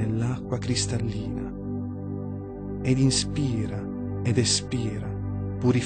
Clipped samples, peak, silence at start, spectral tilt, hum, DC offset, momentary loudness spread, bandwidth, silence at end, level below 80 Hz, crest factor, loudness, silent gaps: under 0.1%; -10 dBFS; 0 s; -5 dB/octave; 50 Hz at -45 dBFS; under 0.1%; 11 LU; 9.4 kHz; 0 s; -44 dBFS; 16 dB; -27 LUFS; none